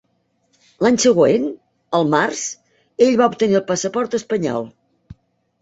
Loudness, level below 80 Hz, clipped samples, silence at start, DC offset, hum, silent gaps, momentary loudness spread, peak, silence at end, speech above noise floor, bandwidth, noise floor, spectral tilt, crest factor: -18 LUFS; -58 dBFS; under 0.1%; 0.8 s; under 0.1%; none; none; 14 LU; -2 dBFS; 0.5 s; 49 dB; 8.2 kHz; -66 dBFS; -4.5 dB/octave; 18 dB